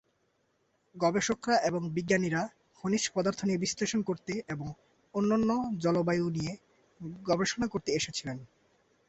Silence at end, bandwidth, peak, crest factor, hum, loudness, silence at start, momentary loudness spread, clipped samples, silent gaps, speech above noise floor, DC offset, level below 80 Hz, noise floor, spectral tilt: 0.65 s; 8.2 kHz; -14 dBFS; 18 dB; none; -31 LUFS; 0.95 s; 12 LU; under 0.1%; none; 44 dB; under 0.1%; -62 dBFS; -74 dBFS; -4.5 dB/octave